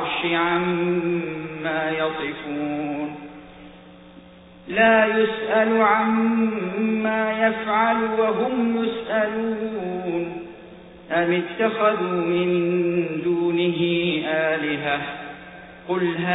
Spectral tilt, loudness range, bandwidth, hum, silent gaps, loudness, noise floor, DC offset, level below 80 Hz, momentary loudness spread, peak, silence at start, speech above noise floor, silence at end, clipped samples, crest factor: -10.5 dB/octave; 6 LU; 4 kHz; none; none; -22 LUFS; -46 dBFS; under 0.1%; -58 dBFS; 12 LU; -4 dBFS; 0 s; 24 dB; 0 s; under 0.1%; 18 dB